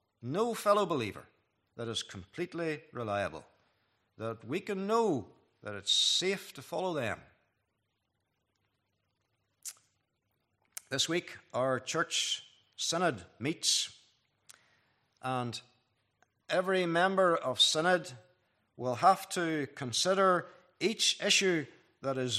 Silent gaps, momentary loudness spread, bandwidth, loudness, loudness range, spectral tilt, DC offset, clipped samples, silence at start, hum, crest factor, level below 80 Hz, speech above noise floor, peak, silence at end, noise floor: none; 16 LU; 14.5 kHz; -31 LUFS; 10 LU; -3 dB/octave; under 0.1%; under 0.1%; 0.2 s; none; 22 dB; -78 dBFS; 50 dB; -12 dBFS; 0 s; -82 dBFS